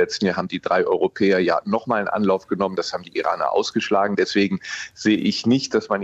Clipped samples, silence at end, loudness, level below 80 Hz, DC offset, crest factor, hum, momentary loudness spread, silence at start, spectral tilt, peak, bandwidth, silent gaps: under 0.1%; 0 s; -21 LUFS; -62 dBFS; under 0.1%; 14 dB; none; 5 LU; 0 s; -5 dB/octave; -6 dBFS; 8.2 kHz; none